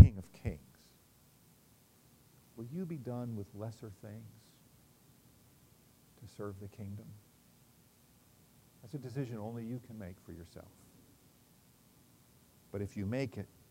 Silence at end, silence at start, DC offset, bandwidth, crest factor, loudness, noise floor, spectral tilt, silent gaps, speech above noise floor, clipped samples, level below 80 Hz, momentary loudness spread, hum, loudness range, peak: 0.25 s; 0 s; under 0.1%; 16 kHz; 30 dB; -40 LUFS; -65 dBFS; -8.5 dB/octave; none; 23 dB; under 0.1%; -56 dBFS; 23 LU; none; 6 LU; -6 dBFS